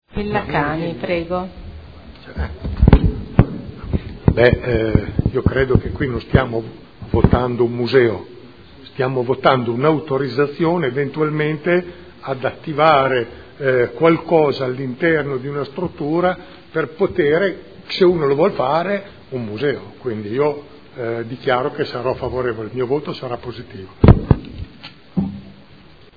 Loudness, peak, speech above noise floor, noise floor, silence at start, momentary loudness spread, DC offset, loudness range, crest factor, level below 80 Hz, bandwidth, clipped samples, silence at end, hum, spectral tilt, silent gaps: -18 LUFS; 0 dBFS; 27 dB; -45 dBFS; 0.15 s; 15 LU; 0.4%; 5 LU; 18 dB; -28 dBFS; 5 kHz; under 0.1%; 0.65 s; none; -9.5 dB/octave; none